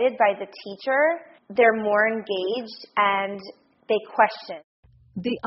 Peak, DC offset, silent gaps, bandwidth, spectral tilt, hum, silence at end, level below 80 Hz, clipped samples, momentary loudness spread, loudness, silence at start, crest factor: -4 dBFS; under 0.1%; 4.64-4.83 s; 6 kHz; -2 dB/octave; none; 0 s; -68 dBFS; under 0.1%; 17 LU; -23 LUFS; 0 s; 20 dB